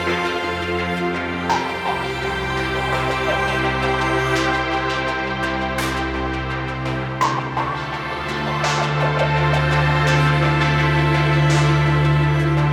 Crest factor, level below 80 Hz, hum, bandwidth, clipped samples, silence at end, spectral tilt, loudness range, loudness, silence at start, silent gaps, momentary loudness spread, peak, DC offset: 16 dB; -34 dBFS; none; 13 kHz; under 0.1%; 0 s; -6 dB/octave; 6 LU; -19 LUFS; 0 s; none; 7 LU; -4 dBFS; under 0.1%